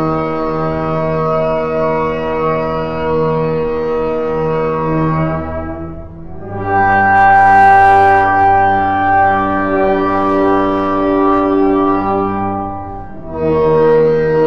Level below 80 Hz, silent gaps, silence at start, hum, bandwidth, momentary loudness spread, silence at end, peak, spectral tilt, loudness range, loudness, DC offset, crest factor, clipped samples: -36 dBFS; none; 0 s; none; 6.6 kHz; 14 LU; 0 s; 0 dBFS; -8.5 dB/octave; 7 LU; -13 LUFS; 2%; 12 dB; under 0.1%